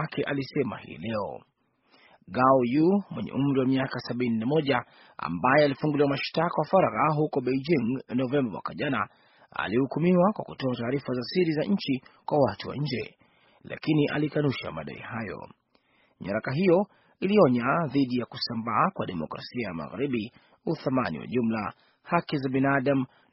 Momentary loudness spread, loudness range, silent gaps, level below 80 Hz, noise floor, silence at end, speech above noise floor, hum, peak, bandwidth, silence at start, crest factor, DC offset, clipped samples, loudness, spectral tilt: 13 LU; 5 LU; none; -62 dBFS; -66 dBFS; 0.25 s; 40 dB; none; -6 dBFS; 5.8 kHz; 0 s; 20 dB; under 0.1%; under 0.1%; -27 LUFS; -5.5 dB/octave